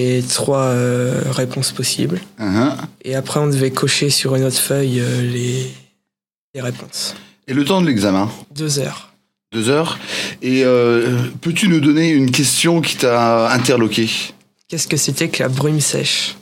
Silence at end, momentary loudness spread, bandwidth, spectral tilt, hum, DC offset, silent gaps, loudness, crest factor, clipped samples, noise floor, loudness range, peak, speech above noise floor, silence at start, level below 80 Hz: 0.05 s; 11 LU; 17 kHz; -4.5 dB/octave; none; under 0.1%; 6.38-6.54 s; -16 LUFS; 16 dB; under 0.1%; -83 dBFS; 6 LU; 0 dBFS; 66 dB; 0 s; -58 dBFS